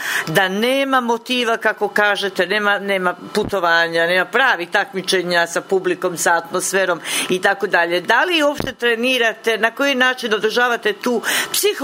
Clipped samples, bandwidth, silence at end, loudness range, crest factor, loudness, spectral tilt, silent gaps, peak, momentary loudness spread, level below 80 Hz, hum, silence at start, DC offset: under 0.1%; 16.5 kHz; 0 s; 1 LU; 16 dB; -17 LUFS; -2.5 dB/octave; none; 0 dBFS; 4 LU; -56 dBFS; none; 0 s; under 0.1%